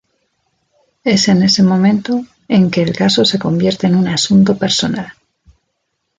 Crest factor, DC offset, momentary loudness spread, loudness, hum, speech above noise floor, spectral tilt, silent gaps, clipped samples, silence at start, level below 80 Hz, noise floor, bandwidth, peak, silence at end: 12 dB; under 0.1%; 9 LU; -13 LUFS; none; 58 dB; -5 dB/octave; none; under 0.1%; 1.05 s; -50 dBFS; -70 dBFS; 9.2 kHz; -2 dBFS; 1.05 s